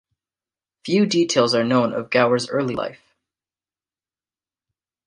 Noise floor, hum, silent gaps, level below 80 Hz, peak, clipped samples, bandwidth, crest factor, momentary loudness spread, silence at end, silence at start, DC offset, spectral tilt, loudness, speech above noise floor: under -90 dBFS; none; none; -64 dBFS; -4 dBFS; under 0.1%; 10.5 kHz; 20 dB; 10 LU; 2.1 s; 0.85 s; under 0.1%; -4.5 dB/octave; -19 LUFS; over 71 dB